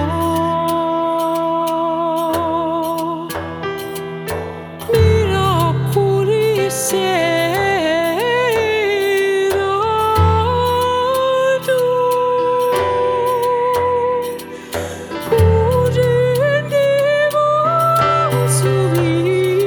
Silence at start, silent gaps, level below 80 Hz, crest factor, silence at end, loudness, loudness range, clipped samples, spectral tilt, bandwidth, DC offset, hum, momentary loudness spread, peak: 0 s; none; -38 dBFS; 14 dB; 0 s; -16 LUFS; 4 LU; under 0.1%; -5.5 dB/octave; 19 kHz; under 0.1%; none; 10 LU; -2 dBFS